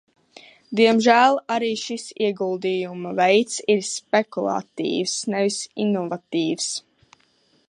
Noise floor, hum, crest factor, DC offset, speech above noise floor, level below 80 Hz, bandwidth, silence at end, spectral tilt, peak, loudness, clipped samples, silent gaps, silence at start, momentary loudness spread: -62 dBFS; none; 20 dB; under 0.1%; 41 dB; -74 dBFS; 11.5 kHz; 0.9 s; -3.5 dB/octave; -4 dBFS; -22 LUFS; under 0.1%; none; 0.7 s; 10 LU